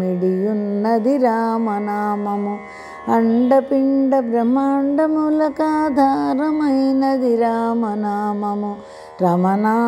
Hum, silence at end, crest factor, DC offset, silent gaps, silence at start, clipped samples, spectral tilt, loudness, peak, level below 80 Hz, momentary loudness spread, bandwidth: none; 0 s; 14 dB; under 0.1%; none; 0 s; under 0.1%; -8.5 dB/octave; -18 LUFS; -4 dBFS; -60 dBFS; 7 LU; 12.5 kHz